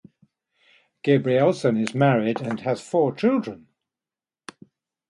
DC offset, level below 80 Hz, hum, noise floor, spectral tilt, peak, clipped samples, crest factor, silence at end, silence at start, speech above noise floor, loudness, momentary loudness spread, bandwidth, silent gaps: under 0.1%; -68 dBFS; none; under -90 dBFS; -7 dB/octave; -6 dBFS; under 0.1%; 18 dB; 1.55 s; 1.05 s; over 69 dB; -22 LUFS; 7 LU; 11.5 kHz; none